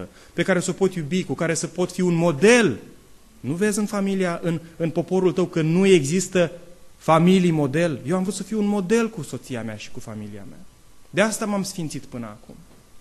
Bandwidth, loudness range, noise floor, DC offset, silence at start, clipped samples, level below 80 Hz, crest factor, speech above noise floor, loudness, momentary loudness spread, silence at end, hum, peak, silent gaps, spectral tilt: 13 kHz; 8 LU; -48 dBFS; under 0.1%; 0 s; under 0.1%; -54 dBFS; 20 dB; 26 dB; -21 LUFS; 18 LU; 0 s; none; -2 dBFS; none; -5.5 dB/octave